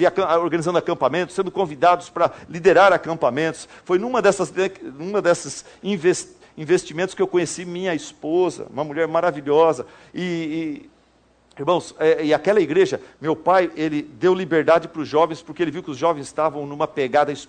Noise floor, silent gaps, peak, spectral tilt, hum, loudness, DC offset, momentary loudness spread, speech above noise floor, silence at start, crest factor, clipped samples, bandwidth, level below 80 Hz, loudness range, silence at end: -58 dBFS; none; -4 dBFS; -5 dB/octave; none; -21 LUFS; under 0.1%; 10 LU; 38 dB; 0 s; 18 dB; under 0.1%; 9.4 kHz; -60 dBFS; 4 LU; 0.05 s